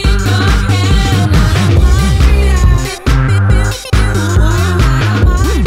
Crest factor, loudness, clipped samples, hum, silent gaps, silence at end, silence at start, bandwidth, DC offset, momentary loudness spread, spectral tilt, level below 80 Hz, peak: 8 dB; -11 LUFS; 0.5%; none; none; 0 s; 0 s; 15.5 kHz; under 0.1%; 3 LU; -5.5 dB/octave; -12 dBFS; 0 dBFS